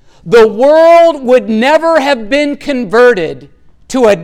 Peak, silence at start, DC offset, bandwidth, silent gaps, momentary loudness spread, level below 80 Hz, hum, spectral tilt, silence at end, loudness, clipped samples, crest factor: 0 dBFS; 0.25 s; under 0.1%; 13 kHz; none; 10 LU; -40 dBFS; none; -5 dB/octave; 0 s; -8 LUFS; under 0.1%; 8 dB